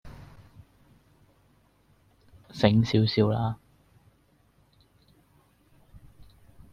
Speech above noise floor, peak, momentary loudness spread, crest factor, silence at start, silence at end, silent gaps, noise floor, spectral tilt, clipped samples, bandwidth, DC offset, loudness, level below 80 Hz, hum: 41 dB; -6 dBFS; 27 LU; 26 dB; 0.05 s; 0.75 s; none; -64 dBFS; -7.5 dB/octave; under 0.1%; 7.2 kHz; under 0.1%; -25 LUFS; -56 dBFS; none